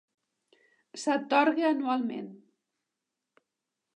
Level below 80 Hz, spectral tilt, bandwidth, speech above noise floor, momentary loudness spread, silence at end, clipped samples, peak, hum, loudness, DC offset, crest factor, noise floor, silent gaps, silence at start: -90 dBFS; -4 dB/octave; 11 kHz; 59 dB; 18 LU; 1.65 s; under 0.1%; -10 dBFS; none; -28 LUFS; under 0.1%; 22 dB; -87 dBFS; none; 0.95 s